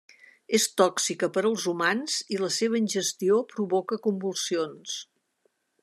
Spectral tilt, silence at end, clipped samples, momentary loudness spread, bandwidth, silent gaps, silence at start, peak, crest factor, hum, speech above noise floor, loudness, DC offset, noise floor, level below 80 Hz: -3 dB/octave; 0.8 s; under 0.1%; 6 LU; 13.5 kHz; none; 0.5 s; -8 dBFS; 18 dB; none; 46 dB; -26 LUFS; under 0.1%; -72 dBFS; -82 dBFS